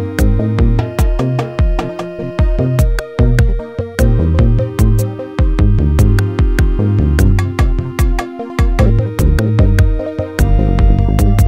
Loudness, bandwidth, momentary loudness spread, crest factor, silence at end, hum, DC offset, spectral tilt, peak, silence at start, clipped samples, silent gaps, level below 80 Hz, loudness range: -14 LUFS; 16 kHz; 6 LU; 12 dB; 0 s; none; under 0.1%; -7.5 dB/octave; 0 dBFS; 0 s; under 0.1%; none; -14 dBFS; 2 LU